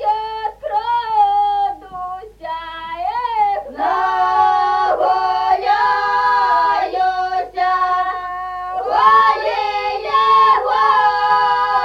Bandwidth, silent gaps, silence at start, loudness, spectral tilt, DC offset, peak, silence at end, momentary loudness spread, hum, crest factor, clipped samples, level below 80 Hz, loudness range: 8 kHz; none; 0 s; -16 LUFS; -3 dB/octave; under 0.1%; -2 dBFS; 0 s; 13 LU; none; 14 dB; under 0.1%; -50 dBFS; 5 LU